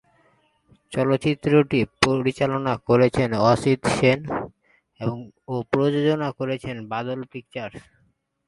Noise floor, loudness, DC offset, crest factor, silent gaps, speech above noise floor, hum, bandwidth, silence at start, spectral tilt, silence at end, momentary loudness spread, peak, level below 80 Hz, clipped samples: -66 dBFS; -22 LUFS; under 0.1%; 22 dB; none; 44 dB; none; 11.5 kHz; 0.9 s; -6 dB/octave; 0.65 s; 14 LU; 0 dBFS; -52 dBFS; under 0.1%